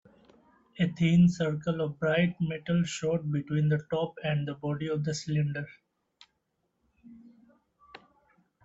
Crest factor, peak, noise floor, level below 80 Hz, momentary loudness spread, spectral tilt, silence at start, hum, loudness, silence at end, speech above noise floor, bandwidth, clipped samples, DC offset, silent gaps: 18 dB; -14 dBFS; -78 dBFS; -62 dBFS; 9 LU; -7 dB/octave; 0.75 s; none; -29 LUFS; 0.65 s; 50 dB; 7.8 kHz; under 0.1%; under 0.1%; none